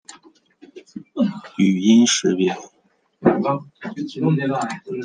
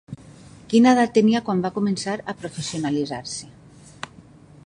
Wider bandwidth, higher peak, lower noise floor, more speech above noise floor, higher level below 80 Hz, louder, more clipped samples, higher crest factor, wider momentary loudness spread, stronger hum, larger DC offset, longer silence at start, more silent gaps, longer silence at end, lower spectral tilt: about the same, 10 kHz vs 11 kHz; about the same, -2 dBFS vs -2 dBFS; first, -63 dBFS vs -47 dBFS; first, 44 dB vs 27 dB; second, -66 dBFS vs -58 dBFS; about the same, -19 LUFS vs -21 LUFS; neither; about the same, 18 dB vs 20 dB; second, 19 LU vs 22 LU; neither; neither; about the same, 0.1 s vs 0.1 s; neither; second, 0 s vs 0.6 s; about the same, -5 dB/octave vs -5.5 dB/octave